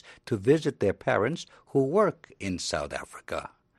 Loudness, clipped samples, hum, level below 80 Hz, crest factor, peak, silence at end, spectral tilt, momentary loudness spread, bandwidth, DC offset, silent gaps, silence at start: -28 LUFS; under 0.1%; none; -56 dBFS; 18 dB; -10 dBFS; 0.3 s; -5.5 dB/octave; 12 LU; 12.5 kHz; under 0.1%; none; 0.05 s